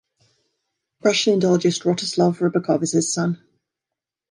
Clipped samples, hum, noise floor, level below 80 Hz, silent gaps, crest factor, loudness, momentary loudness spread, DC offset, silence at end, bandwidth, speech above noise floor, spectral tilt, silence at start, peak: under 0.1%; none; -86 dBFS; -68 dBFS; none; 18 dB; -20 LUFS; 6 LU; under 0.1%; 0.95 s; 11.5 kHz; 67 dB; -4.5 dB/octave; 1.05 s; -4 dBFS